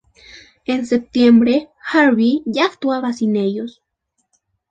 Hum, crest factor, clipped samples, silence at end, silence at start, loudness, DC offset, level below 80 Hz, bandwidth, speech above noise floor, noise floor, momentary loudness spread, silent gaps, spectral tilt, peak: none; 16 dB; under 0.1%; 1 s; 0.35 s; -16 LUFS; under 0.1%; -56 dBFS; 7.8 kHz; 56 dB; -71 dBFS; 11 LU; none; -6 dB/octave; -2 dBFS